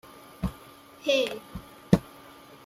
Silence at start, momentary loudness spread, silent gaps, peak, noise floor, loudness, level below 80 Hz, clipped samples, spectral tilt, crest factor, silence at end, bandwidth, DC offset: 0.4 s; 23 LU; none; -2 dBFS; -50 dBFS; -28 LUFS; -48 dBFS; under 0.1%; -6 dB/octave; 28 dB; 0.55 s; 15.5 kHz; under 0.1%